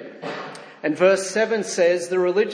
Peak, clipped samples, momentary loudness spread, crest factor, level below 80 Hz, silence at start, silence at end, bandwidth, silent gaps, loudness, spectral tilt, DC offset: -4 dBFS; under 0.1%; 14 LU; 18 dB; -80 dBFS; 0 s; 0 s; 10.5 kHz; none; -20 LUFS; -4 dB/octave; under 0.1%